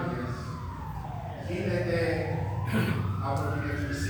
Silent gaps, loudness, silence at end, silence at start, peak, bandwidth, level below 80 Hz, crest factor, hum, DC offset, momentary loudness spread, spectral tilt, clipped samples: none; -31 LUFS; 0 s; 0 s; -16 dBFS; over 20 kHz; -44 dBFS; 14 dB; none; under 0.1%; 9 LU; -7 dB/octave; under 0.1%